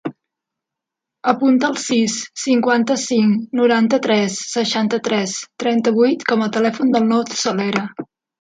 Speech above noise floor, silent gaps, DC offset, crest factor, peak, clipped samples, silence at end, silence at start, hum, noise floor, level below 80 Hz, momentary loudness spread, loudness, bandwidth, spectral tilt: 67 dB; none; under 0.1%; 18 dB; 0 dBFS; under 0.1%; 0.35 s; 0.05 s; none; -84 dBFS; -66 dBFS; 8 LU; -17 LUFS; 9.4 kHz; -4 dB/octave